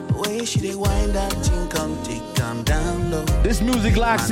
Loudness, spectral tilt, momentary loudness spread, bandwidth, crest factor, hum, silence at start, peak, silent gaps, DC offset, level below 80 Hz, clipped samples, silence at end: -22 LUFS; -5 dB/octave; 6 LU; 16.5 kHz; 16 dB; none; 0 s; -4 dBFS; none; under 0.1%; -26 dBFS; under 0.1%; 0 s